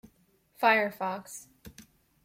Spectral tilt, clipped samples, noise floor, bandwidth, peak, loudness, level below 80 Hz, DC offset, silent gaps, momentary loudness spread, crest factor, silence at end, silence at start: -3.5 dB/octave; under 0.1%; -67 dBFS; 16.5 kHz; -10 dBFS; -28 LUFS; -68 dBFS; under 0.1%; none; 21 LU; 22 dB; 0.45 s; 0.6 s